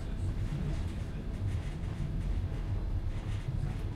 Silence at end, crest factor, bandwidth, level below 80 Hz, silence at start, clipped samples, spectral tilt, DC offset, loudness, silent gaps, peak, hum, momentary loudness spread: 0 s; 10 dB; 11 kHz; -36 dBFS; 0 s; under 0.1%; -7.5 dB/octave; under 0.1%; -37 LUFS; none; -24 dBFS; none; 2 LU